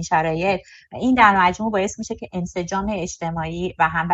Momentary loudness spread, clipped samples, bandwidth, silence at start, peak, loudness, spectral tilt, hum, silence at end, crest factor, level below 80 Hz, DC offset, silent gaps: 14 LU; under 0.1%; 8.2 kHz; 0 s; -2 dBFS; -21 LUFS; -5 dB/octave; none; 0 s; 20 dB; -44 dBFS; under 0.1%; none